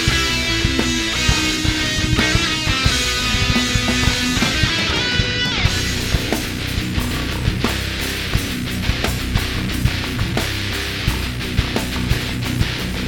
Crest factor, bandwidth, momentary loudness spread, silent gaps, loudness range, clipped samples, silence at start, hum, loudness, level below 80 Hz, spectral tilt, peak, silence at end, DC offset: 18 dB; 20 kHz; 5 LU; none; 4 LU; under 0.1%; 0 s; none; -18 LUFS; -26 dBFS; -3.5 dB/octave; 0 dBFS; 0 s; under 0.1%